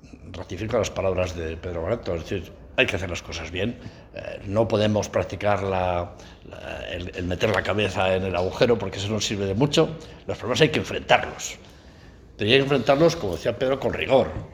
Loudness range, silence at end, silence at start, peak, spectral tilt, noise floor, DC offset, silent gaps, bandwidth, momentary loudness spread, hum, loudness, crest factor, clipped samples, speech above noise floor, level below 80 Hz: 4 LU; 0.05 s; 0.05 s; 0 dBFS; -5 dB/octave; -47 dBFS; under 0.1%; none; 19.5 kHz; 15 LU; none; -24 LUFS; 24 dB; under 0.1%; 23 dB; -46 dBFS